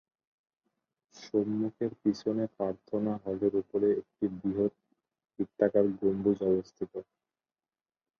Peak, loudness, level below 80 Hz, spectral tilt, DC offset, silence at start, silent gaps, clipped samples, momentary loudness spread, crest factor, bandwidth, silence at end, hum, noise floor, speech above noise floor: -12 dBFS; -31 LUFS; -66 dBFS; -8.5 dB/octave; under 0.1%; 1.15 s; none; under 0.1%; 11 LU; 20 dB; 6.8 kHz; 1.15 s; none; under -90 dBFS; over 60 dB